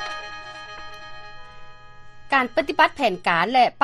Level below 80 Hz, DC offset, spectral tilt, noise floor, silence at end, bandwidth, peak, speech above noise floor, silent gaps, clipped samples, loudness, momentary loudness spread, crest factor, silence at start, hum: -52 dBFS; under 0.1%; -4 dB/octave; -41 dBFS; 0 s; 13 kHz; -2 dBFS; 21 dB; none; under 0.1%; -21 LUFS; 21 LU; 22 dB; 0 s; none